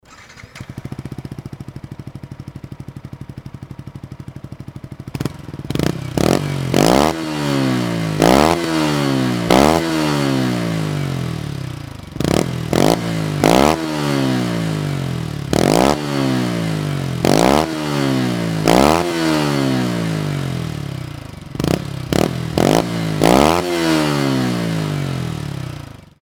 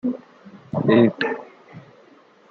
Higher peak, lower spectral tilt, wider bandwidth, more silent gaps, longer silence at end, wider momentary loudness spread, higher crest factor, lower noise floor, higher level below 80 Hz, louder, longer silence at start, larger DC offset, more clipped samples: first, 0 dBFS vs -4 dBFS; second, -5.5 dB/octave vs -9 dB/octave; first, over 20 kHz vs 6 kHz; neither; second, 0.3 s vs 0.7 s; about the same, 21 LU vs 19 LU; about the same, 18 dB vs 20 dB; second, -40 dBFS vs -52 dBFS; first, -38 dBFS vs -66 dBFS; first, -17 LUFS vs -20 LUFS; about the same, 0.1 s vs 0.05 s; neither; neither